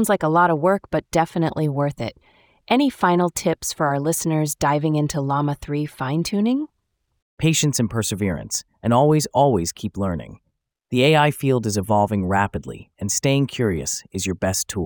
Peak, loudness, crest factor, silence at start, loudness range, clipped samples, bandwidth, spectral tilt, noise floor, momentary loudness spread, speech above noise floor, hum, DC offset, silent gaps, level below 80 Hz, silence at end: -4 dBFS; -21 LUFS; 16 dB; 0 s; 3 LU; under 0.1%; over 20 kHz; -5 dB/octave; -72 dBFS; 9 LU; 52 dB; none; under 0.1%; 7.22-7.37 s; -50 dBFS; 0 s